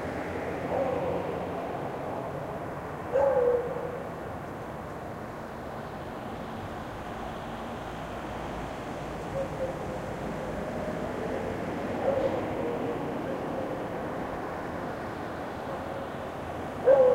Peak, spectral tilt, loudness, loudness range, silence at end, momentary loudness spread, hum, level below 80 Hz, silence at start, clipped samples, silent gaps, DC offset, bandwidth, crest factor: -10 dBFS; -7 dB/octave; -33 LUFS; 7 LU; 0 s; 10 LU; none; -50 dBFS; 0 s; under 0.1%; none; under 0.1%; 16 kHz; 22 dB